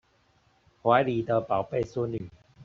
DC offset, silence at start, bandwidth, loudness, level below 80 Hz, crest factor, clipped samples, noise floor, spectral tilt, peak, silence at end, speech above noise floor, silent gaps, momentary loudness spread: under 0.1%; 0.85 s; 7.4 kHz; -27 LUFS; -60 dBFS; 22 dB; under 0.1%; -66 dBFS; -5.5 dB/octave; -8 dBFS; 0 s; 39 dB; none; 11 LU